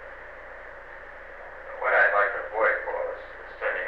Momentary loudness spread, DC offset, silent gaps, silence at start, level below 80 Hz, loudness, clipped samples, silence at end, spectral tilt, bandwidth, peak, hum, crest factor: 21 LU; 0.2%; none; 0 s; -54 dBFS; -25 LUFS; under 0.1%; 0 s; -5 dB/octave; 6 kHz; -10 dBFS; 60 Hz at -60 dBFS; 18 dB